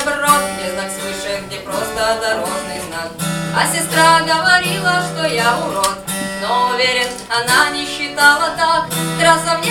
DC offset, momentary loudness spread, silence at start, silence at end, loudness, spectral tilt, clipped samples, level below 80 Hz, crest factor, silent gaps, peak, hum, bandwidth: under 0.1%; 11 LU; 0 s; 0 s; -15 LUFS; -2.5 dB/octave; under 0.1%; -46 dBFS; 16 dB; none; 0 dBFS; none; 18 kHz